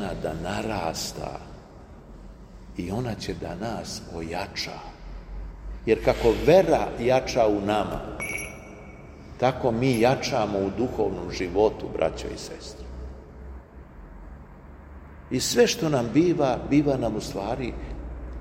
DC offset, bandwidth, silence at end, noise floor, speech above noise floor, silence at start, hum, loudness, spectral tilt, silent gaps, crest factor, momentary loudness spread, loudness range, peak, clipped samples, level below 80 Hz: under 0.1%; 16 kHz; 0 s; -46 dBFS; 21 dB; 0 s; none; -25 LUFS; -5 dB/octave; none; 20 dB; 23 LU; 11 LU; -6 dBFS; under 0.1%; -42 dBFS